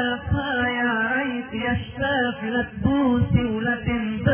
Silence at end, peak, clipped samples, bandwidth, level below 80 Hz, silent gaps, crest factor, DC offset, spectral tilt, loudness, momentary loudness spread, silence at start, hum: 0 s; -6 dBFS; under 0.1%; 3.5 kHz; -38 dBFS; none; 16 dB; under 0.1%; -10.5 dB/octave; -23 LUFS; 5 LU; 0 s; none